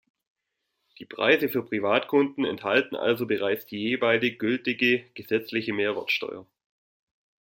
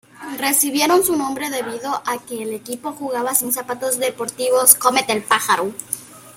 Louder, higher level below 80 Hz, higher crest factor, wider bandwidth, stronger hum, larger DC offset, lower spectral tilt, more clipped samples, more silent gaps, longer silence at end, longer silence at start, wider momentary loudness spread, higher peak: second, -25 LUFS vs -18 LUFS; second, -72 dBFS vs -62 dBFS; about the same, 20 dB vs 20 dB; about the same, 16.5 kHz vs 16.5 kHz; neither; neither; first, -6 dB/octave vs -1.5 dB/octave; neither; neither; first, 1.15 s vs 0.05 s; first, 1 s vs 0.2 s; second, 7 LU vs 14 LU; second, -6 dBFS vs 0 dBFS